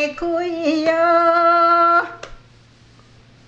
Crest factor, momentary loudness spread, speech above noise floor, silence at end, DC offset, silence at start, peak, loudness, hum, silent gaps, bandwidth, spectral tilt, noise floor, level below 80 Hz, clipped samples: 14 dB; 9 LU; 31 dB; 1.15 s; under 0.1%; 0 s; -4 dBFS; -15 LUFS; none; none; 8 kHz; -4.5 dB/octave; -49 dBFS; -50 dBFS; under 0.1%